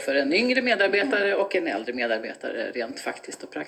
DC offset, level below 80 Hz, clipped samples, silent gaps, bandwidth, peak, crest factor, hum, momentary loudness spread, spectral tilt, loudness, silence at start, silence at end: under 0.1%; -70 dBFS; under 0.1%; none; 14 kHz; -8 dBFS; 18 dB; none; 12 LU; -3 dB/octave; -24 LUFS; 0 s; 0 s